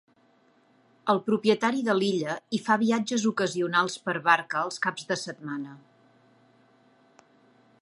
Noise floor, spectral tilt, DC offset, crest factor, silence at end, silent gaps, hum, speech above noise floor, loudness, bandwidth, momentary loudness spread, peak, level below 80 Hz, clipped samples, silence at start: -63 dBFS; -4.5 dB/octave; under 0.1%; 22 dB; 2.05 s; none; none; 37 dB; -26 LUFS; 11 kHz; 11 LU; -6 dBFS; -80 dBFS; under 0.1%; 1.05 s